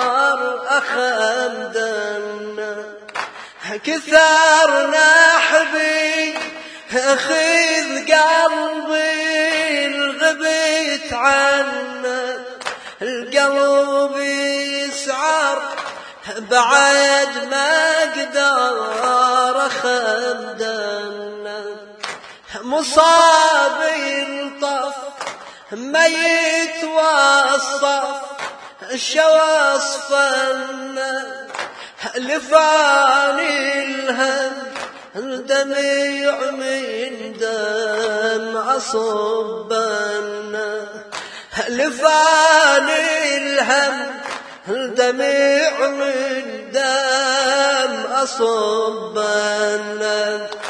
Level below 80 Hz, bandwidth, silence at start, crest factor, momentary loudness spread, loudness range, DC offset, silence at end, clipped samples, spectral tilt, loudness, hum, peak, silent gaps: -64 dBFS; 10.5 kHz; 0 s; 18 dB; 16 LU; 6 LU; under 0.1%; 0 s; under 0.1%; -1 dB/octave; -16 LUFS; none; 0 dBFS; none